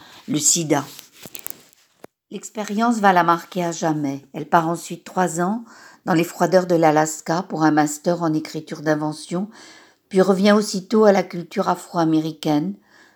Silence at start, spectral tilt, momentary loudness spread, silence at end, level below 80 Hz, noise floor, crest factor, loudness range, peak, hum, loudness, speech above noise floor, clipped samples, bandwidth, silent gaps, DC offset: 0.15 s; -4.5 dB/octave; 16 LU; 0.4 s; -76 dBFS; -53 dBFS; 20 dB; 3 LU; 0 dBFS; none; -20 LUFS; 33 dB; under 0.1%; over 20 kHz; none; under 0.1%